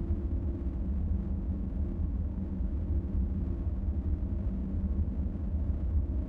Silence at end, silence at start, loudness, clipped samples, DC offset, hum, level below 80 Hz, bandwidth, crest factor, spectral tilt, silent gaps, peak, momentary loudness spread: 0 s; 0 s; -34 LUFS; under 0.1%; under 0.1%; none; -32 dBFS; 2.5 kHz; 12 dB; -12 dB/octave; none; -20 dBFS; 3 LU